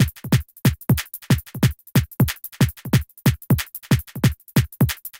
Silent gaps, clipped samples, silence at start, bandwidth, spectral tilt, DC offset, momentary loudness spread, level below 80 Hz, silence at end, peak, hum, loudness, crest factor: none; under 0.1%; 0 s; 17.5 kHz; -5.5 dB/octave; under 0.1%; 3 LU; -36 dBFS; 0.1 s; -4 dBFS; none; -22 LUFS; 18 dB